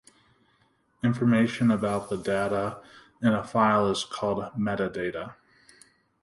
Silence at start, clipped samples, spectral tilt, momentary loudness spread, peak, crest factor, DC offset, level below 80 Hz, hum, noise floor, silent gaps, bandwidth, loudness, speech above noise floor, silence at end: 1.05 s; under 0.1%; -6.5 dB/octave; 10 LU; -8 dBFS; 20 dB; under 0.1%; -60 dBFS; none; -67 dBFS; none; 11.5 kHz; -26 LUFS; 41 dB; 0.9 s